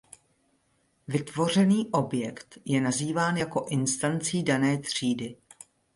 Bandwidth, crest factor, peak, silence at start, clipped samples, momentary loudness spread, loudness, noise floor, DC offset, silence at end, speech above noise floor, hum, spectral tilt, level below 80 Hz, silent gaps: 11.5 kHz; 18 dB; -10 dBFS; 1.1 s; under 0.1%; 9 LU; -27 LUFS; -70 dBFS; under 0.1%; 0.6 s; 43 dB; none; -5 dB/octave; -66 dBFS; none